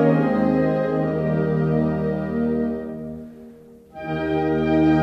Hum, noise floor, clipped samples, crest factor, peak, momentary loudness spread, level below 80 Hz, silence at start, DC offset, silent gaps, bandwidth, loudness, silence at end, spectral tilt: none; -45 dBFS; under 0.1%; 16 dB; -6 dBFS; 14 LU; -44 dBFS; 0 s; under 0.1%; none; 6 kHz; -22 LUFS; 0 s; -9.5 dB/octave